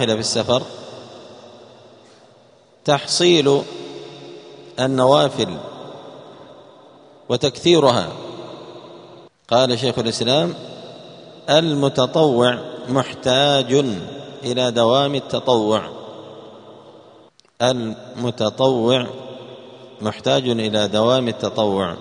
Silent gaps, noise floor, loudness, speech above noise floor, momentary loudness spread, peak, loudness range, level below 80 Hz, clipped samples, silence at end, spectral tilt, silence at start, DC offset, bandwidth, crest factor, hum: none; -51 dBFS; -18 LUFS; 34 dB; 23 LU; 0 dBFS; 4 LU; -58 dBFS; under 0.1%; 0 s; -4.5 dB/octave; 0 s; under 0.1%; 10.5 kHz; 20 dB; none